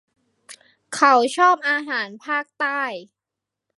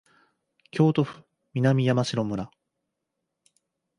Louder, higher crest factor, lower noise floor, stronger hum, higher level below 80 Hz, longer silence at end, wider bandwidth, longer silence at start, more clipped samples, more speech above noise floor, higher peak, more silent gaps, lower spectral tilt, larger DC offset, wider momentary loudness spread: first, -20 LUFS vs -25 LUFS; about the same, 20 dB vs 18 dB; about the same, -85 dBFS vs -82 dBFS; neither; second, -80 dBFS vs -62 dBFS; second, 0.75 s vs 1.5 s; about the same, 11.5 kHz vs 11 kHz; second, 0.5 s vs 0.75 s; neither; first, 65 dB vs 59 dB; first, -2 dBFS vs -10 dBFS; neither; second, -2 dB/octave vs -7 dB/octave; neither; about the same, 12 LU vs 13 LU